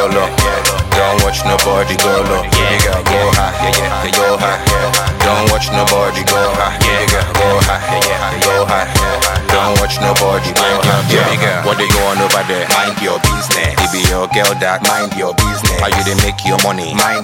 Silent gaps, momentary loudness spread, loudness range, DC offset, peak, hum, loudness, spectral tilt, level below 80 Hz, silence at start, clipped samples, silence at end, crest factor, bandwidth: none; 2 LU; 1 LU; under 0.1%; 0 dBFS; none; -12 LUFS; -3.5 dB/octave; -24 dBFS; 0 s; under 0.1%; 0 s; 12 dB; 17 kHz